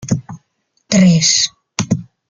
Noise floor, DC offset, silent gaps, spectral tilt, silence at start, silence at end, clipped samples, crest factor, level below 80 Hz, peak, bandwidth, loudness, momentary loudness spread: -65 dBFS; under 0.1%; none; -4 dB/octave; 0 s; 0.25 s; under 0.1%; 16 dB; -48 dBFS; 0 dBFS; 9.4 kHz; -14 LUFS; 12 LU